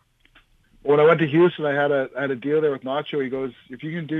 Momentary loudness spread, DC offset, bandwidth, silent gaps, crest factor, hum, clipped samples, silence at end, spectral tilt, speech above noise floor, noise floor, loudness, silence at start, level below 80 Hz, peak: 15 LU; under 0.1%; 4.1 kHz; none; 18 dB; none; under 0.1%; 0 s; -8.5 dB/octave; 37 dB; -58 dBFS; -21 LUFS; 0.85 s; -64 dBFS; -4 dBFS